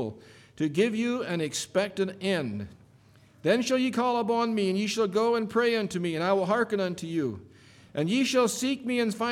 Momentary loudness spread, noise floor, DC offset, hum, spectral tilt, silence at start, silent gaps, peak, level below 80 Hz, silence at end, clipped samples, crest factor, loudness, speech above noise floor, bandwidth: 8 LU; -57 dBFS; under 0.1%; none; -4.5 dB/octave; 0 s; none; -12 dBFS; -68 dBFS; 0 s; under 0.1%; 16 dB; -27 LUFS; 30 dB; 16.5 kHz